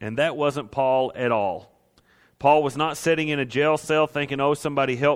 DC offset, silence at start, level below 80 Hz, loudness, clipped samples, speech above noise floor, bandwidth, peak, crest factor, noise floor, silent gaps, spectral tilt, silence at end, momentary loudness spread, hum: under 0.1%; 0 s; -60 dBFS; -23 LUFS; under 0.1%; 38 dB; 16 kHz; -4 dBFS; 18 dB; -60 dBFS; none; -5 dB/octave; 0 s; 5 LU; none